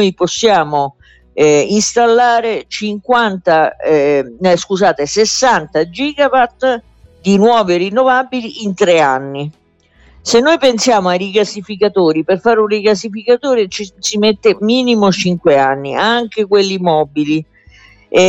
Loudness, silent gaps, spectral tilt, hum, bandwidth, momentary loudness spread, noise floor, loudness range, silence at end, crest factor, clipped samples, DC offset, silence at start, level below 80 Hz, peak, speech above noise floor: -13 LUFS; none; -4 dB/octave; none; 8.6 kHz; 8 LU; -49 dBFS; 1 LU; 0 s; 12 dB; under 0.1%; under 0.1%; 0 s; -50 dBFS; 0 dBFS; 37 dB